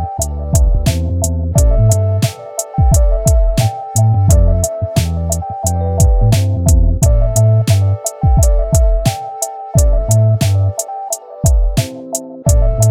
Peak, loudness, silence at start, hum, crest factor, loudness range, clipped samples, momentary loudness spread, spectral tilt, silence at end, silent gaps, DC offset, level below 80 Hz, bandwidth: -2 dBFS; -14 LUFS; 0 s; none; 10 dB; 2 LU; under 0.1%; 8 LU; -5.5 dB/octave; 0 s; none; under 0.1%; -16 dBFS; 17 kHz